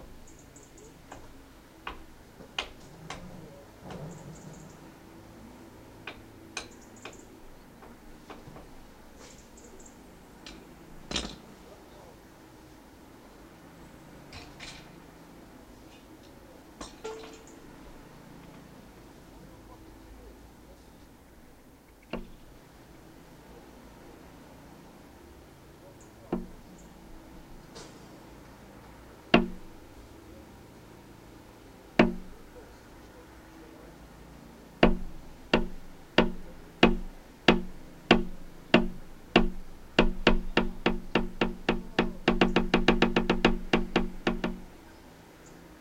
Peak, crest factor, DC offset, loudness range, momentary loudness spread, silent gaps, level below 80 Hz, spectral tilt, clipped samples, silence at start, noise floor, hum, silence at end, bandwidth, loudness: -4 dBFS; 30 dB; under 0.1%; 22 LU; 26 LU; none; -40 dBFS; -5.5 dB/octave; under 0.1%; 0 s; -55 dBFS; none; 0.05 s; 16 kHz; -29 LUFS